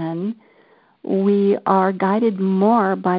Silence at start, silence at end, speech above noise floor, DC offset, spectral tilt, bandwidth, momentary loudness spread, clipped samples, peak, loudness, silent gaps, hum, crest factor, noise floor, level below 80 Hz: 0 s; 0 s; 37 dB; under 0.1%; -12.5 dB/octave; 4.9 kHz; 12 LU; under 0.1%; -4 dBFS; -18 LUFS; none; none; 16 dB; -54 dBFS; -68 dBFS